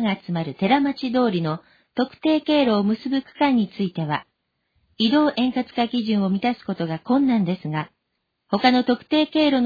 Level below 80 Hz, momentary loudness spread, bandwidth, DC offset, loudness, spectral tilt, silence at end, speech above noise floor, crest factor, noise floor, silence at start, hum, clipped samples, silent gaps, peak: -60 dBFS; 9 LU; 5 kHz; under 0.1%; -22 LUFS; -8 dB/octave; 0 s; 55 dB; 16 dB; -76 dBFS; 0 s; none; under 0.1%; none; -4 dBFS